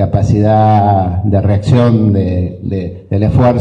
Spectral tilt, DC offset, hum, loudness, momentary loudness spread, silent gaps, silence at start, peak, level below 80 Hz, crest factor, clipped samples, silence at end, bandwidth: -9.5 dB/octave; under 0.1%; none; -12 LUFS; 9 LU; none; 0 s; 0 dBFS; -30 dBFS; 10 dB; under 0.1%; 0 s; 8 kHz